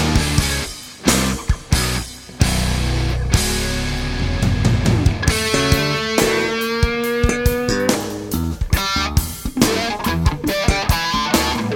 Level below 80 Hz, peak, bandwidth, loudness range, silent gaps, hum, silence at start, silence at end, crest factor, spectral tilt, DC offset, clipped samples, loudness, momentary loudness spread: -24 dBFS; 0 dBFS; 19.5 kHz; 2 LU; none; none; 0 s; 0 s; 18 dB; -4.5 dB/octave; under 0.1%; under 0.1%; -18 LUFS; 6 LU